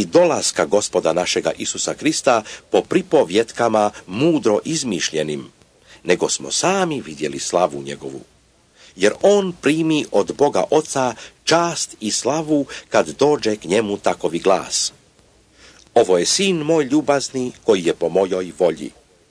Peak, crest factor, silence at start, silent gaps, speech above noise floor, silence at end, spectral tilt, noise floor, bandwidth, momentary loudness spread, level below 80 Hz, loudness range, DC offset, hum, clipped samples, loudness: -2 dBFS; 18 dB; 0 s; none; 35 dB; 0.4 s; -3.5 dB/octave; -54 dBFS; 11 kHz; 8 LU; -58 dBFS; 3 LU; under 0.1%; none; under 0.1%; -18 LUFS